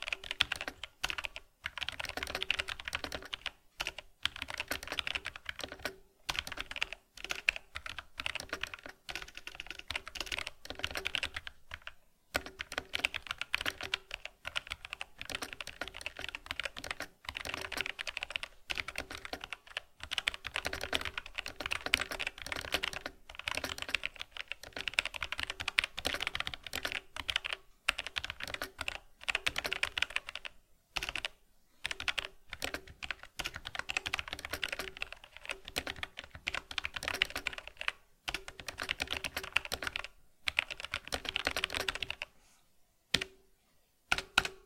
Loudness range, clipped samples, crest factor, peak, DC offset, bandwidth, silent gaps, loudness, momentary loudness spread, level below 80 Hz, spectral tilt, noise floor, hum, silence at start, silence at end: 4 LU; under 0.1%; 36 dB; -4 dBFS; under 0.1%; 16.5 kHz; none; -38 LUFS; 10 LU; -56 dBFS; -1 dB/octave; -71 dBFS; none; 0 s; 0 s